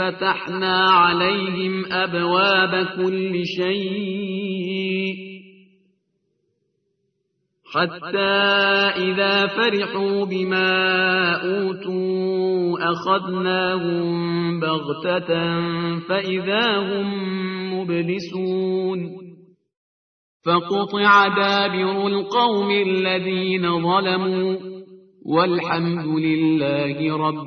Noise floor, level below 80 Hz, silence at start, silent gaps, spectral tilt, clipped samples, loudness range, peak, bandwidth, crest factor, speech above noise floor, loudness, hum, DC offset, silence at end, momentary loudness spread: -73 dBFS; -64 dBFS; 0 s; 19.77-20.40 s; -6.5 dB/octave; under 0.1%; 8 LU; -2 dBFS; 6.6 kHz; 18 dB; 52 dB; -20 LUFS; none; under 0.1%; 0 s; 9 LU